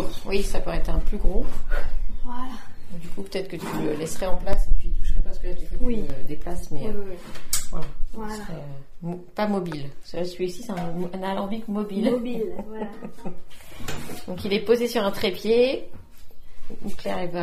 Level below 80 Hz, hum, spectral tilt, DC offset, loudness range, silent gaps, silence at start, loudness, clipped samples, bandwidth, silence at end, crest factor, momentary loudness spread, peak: -28 dBFS; none; -5 dB/octave; under 0.1%; 6 LU; none; 0 s; -29 LUFS; under 0.1%; 15 kHz; 0 s; 16 dB; 14 LU; -2 dBFS